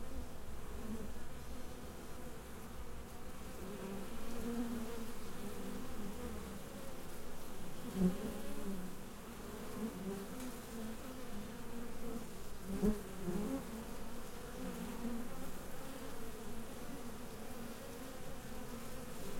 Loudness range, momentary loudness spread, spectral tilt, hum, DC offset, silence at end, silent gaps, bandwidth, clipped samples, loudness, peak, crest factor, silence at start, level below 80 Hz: 6 LU; 9 LU; -5.5 dB/octave; none; under 0.1%; 0 s; none; 16.5 kHz; under 0.1%; -46 LUFS; -22 dBFS; 20 dB; 0 s; -52 dBFS